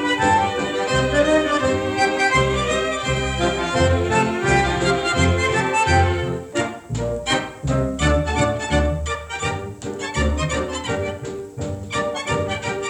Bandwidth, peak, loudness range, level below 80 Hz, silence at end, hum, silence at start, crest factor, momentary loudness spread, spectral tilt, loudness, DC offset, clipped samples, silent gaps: 11.5 kHz; -4 dBFS; 6 LU; -32 dBFS; 0 s; none; 0 s; 16 dB; 9 LU; -5 dB/octave; -20 LUFS; under 0.1%; under 0.1%; none